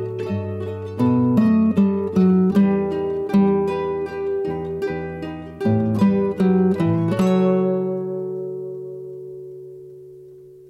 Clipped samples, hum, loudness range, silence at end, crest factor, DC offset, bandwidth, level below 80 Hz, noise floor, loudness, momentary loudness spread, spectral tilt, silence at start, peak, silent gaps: under 0.1%; none; 5 LU; 0.1 s; 12 dB; under 0.1%; 8.2 kHz; -56 dBFS; -43 dBFS; -20 LUFS; 17 LU; -9.5 dB/octave; 0 s; -8 dBFS; none